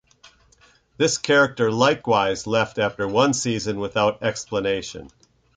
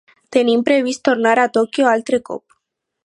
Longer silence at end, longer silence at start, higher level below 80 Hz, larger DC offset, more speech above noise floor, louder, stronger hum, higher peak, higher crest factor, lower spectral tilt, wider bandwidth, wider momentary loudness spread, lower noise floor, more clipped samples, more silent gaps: second, 0.5 s vs 0.65 s; first, 1 s vs 0.3 s; first, -54 dBFS vs -66 dBFS; neither; second, 36 dB vs 59 dB; second, -21 LUFS vs -16 LUFS; neither; second, -4 dBFS vs 0 dBFS; about the same, 18 dB vs 16 dB; about the same, -4 dB/octave vs -4 dB/octave; second, 9.6 kHz vs 11 kHz; about the same, 8 LU vs 7 LU; second, -57 dBFS vs -75 dBFS; neither; neither